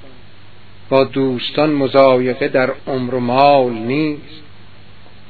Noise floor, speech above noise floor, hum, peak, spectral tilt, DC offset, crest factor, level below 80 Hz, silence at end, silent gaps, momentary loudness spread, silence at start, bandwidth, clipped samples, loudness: -44 dBFS; 29 dB; none; 0 dBFS; -9 dB/octave; 2%; 16 dB; -54 dBFS; 0.9 s; none; 9 LU; 0.9 s; 5.4 kHz; under 0.1%; -15 LUFS